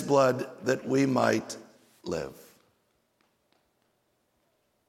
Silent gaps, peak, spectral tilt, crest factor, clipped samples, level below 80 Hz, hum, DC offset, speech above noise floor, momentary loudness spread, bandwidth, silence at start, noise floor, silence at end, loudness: none; -10 dBFS; -5.5 dB/octave; 22 dB; under 0.1%; -68 dBFS; none; under 0.1%; 47 dB; 18 LU; 15.5 kHz; 0 s; -73 dBFS; 2.55 s; -28 LUFS